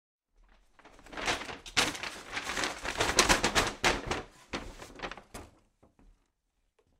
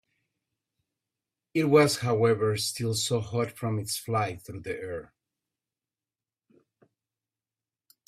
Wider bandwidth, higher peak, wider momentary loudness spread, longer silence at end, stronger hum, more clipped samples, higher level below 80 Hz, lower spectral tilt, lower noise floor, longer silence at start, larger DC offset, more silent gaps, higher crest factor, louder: about the same, 16 kHz vs 15.5 kHz; first, -4 dBFS vs -8 dBFS; first, 19 LU vs 15 LU; second, 1.55 s vs 3 s; neither; neither; first, -48 dBFS vs -66 dBFS; second, -2 dB/octave vs -5 dB/octave; second, -78 dBFS vs under -90 dBFS; second, 0.85 s vs 1.55 s; neither; neither; first, 30 dB vs 22 dB; second, -30 LUFS vs -27 LUFS